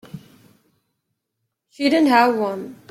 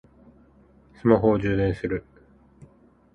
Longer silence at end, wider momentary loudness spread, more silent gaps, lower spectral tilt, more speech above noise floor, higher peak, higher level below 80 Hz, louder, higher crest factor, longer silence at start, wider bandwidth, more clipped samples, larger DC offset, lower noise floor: second, 0.15 s vs 1.15 s; about the same, 11 LU vs 11 LU; neither; second, -5 dB/octave vs -9.5 dB/octave; first, 60 dB vs 34 dB; about the same, -4 dBFS vs -2 dBFS; second, -68 dBFS vs -46 dBFS; first, -18 LUFS vs -23 LUFS; second, 18 dB vs 24 dB; second, 0.15 s vs 1.05 s; first, 15.5 kHz vs 6.6 kHz; neither; neither; first, -78 dBFS vs -56 dBFS